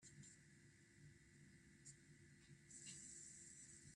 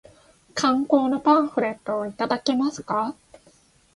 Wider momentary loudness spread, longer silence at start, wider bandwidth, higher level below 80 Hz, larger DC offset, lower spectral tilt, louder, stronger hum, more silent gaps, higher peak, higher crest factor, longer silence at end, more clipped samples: first, 12 LU vs 9 LU; second, 0 s vs 0.55 s; about the same, 12 kHz vs 11.5 kHz; second, -82 dBFS vs -64 dBFS; neither; second, -2.5 dB/octave vs -4.5 dB/octave; second, -62 LUFS vs -23 LUFS; neither; neither; second, -44 dBFS vs -4 dBFS; about the same, 20 dB vs 20 dB; second, 0 s vs 0.85 s; neither